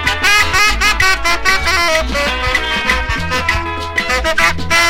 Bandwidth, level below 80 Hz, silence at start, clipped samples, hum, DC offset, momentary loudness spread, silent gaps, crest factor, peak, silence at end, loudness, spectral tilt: 16.5 kHz; -26 dBFS; 0 s; under 0.1%; none; under 0.1%; 6 LU; none; 14 dB; 0 dBFS; 0 s; -13 LUFS; -2 dB/octave